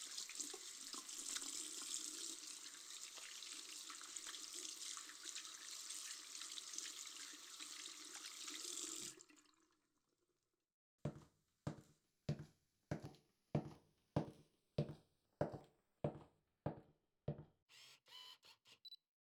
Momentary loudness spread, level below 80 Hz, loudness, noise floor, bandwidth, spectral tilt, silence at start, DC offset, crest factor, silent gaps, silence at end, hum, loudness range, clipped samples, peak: 14 LU; -78 dBFS; -50 LUFS; under -90 dBFS; over 20 kHz; -3 dB/octave; 0 s; under 0.1%; 26 dB; 10.74-10.98 s, 17.62-17.67 s; 0.3 s; none; 6 LU; under 0.1%; -26 dBFS